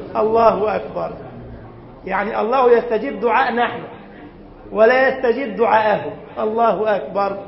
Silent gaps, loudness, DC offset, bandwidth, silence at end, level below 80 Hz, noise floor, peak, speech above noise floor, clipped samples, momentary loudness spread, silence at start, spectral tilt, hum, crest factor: none; -17 LUFS; under 0.1%; 5.8 kHz; 0 s; -48 dBFS; -39 dBFS; 0 dBFS; 22 dB; under 0.1%; 20 LU; 0 s; -10 dB/octave; none; 18 dB